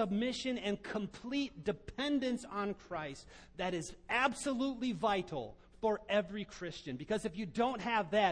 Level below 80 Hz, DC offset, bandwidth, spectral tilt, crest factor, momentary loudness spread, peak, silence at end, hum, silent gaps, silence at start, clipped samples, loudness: -62 dBFS; under 0.1%; 10.5 kHz; -4.5 dB/octave; 20 dB; 10 LU; -18 dBFS; 0 s; none; none; 0 s; under 0.1%; -37 LUFS